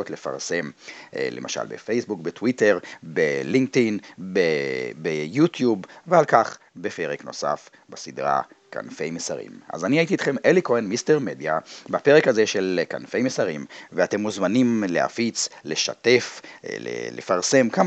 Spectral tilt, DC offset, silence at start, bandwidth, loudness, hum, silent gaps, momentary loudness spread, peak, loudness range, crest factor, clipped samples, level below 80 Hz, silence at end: -4.5 dB/octave; under 0.1%; 0 s; 8.6 kHz; -23 LUFS; none; none; 13 LU; -2 dBFS; 5 LU; 22 dB; under 0.1%; -74 dBFS; 0 s